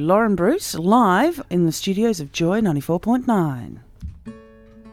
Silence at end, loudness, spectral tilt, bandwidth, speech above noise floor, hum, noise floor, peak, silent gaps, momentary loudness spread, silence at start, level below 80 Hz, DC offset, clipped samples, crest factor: 0 s; -19 LUFS; -6 dB/octave; 17 kHz; 26 dB; none; -45 dBFS; -4 dBFS; none; 21 LU; 0 s; -46 dBFS; under 0.1%; under 0.1%; 16 dB